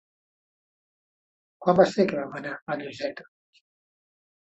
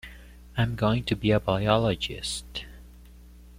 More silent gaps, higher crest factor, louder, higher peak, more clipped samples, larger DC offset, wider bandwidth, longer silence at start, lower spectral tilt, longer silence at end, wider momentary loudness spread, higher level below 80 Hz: first, 2.62-2.66 s vs none; about the same, 24 dB vs 22 dB; about the same, -26 LUFS vs -26 LUFS; about the same, -6 dBFS vs -6 dBFS; neither; neither; second, 8.2 kHz vs 15.5 kHz; first, 1.6 s vs 0.05 s; about the same, -6.5 dB/octave vs -5.5 dB/octave; first, 1.2 s vs 0 s; about the same, 14 LU vs 15 LU; second, -68 dBFS vs -44 dBFS